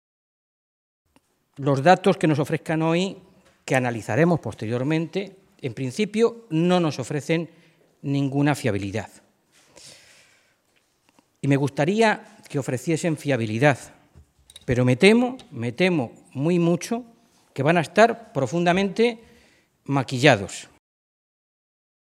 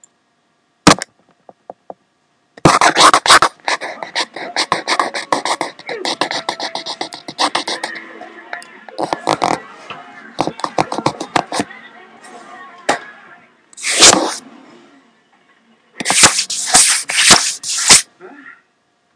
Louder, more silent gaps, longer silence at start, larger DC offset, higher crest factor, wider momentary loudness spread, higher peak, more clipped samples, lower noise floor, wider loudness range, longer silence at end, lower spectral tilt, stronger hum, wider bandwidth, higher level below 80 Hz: second, -22 LUFS vs -13 LUFS; neither; first, 1.6 s vs 0.85 s; neither; first, 22 dB vs 16 dB; second, 14 LU vs 22 LU; about the same, 0 dBFS vs 0 dBFS; second, under 0.1% vs 0.2%; first, -66 dBFS vs -61 dBFS; second, 5 LU vs 11 LU; first, 1.5 s vs 0.65 s; first, -6 dB/octave vs -1 dB/octave; neither; first, 14 kHz vs 11 kHz; second, -58 dBFS vs -46 dBFS